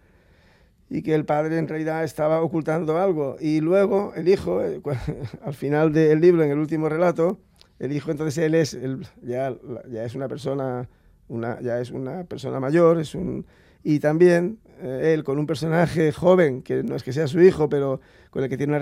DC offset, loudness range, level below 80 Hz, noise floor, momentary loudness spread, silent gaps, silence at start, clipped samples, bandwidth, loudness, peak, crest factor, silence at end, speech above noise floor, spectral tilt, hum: under 0.1%; 6 LU; -54 dBFS; -57 dBFS; 15 LU; none; 0.9 s; under 0.1%; 14 kHz; -22 LUFS; -4 dBFS; 18 dB; 0 s; 35 dB; -7.5 dB/octave; none